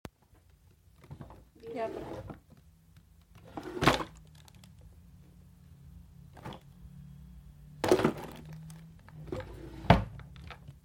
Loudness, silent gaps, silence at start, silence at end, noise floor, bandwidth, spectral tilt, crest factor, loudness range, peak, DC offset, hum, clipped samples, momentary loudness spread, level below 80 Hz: -32 LUFS; none; 0.05 s; 0.05 s; -63 dBFS; 16.5 kHz; -6 dB/octave; 30 dB; 18 LU; -8 dBFS; under 0.1%; none; under 0.1%; 27 LU; -50 dBFS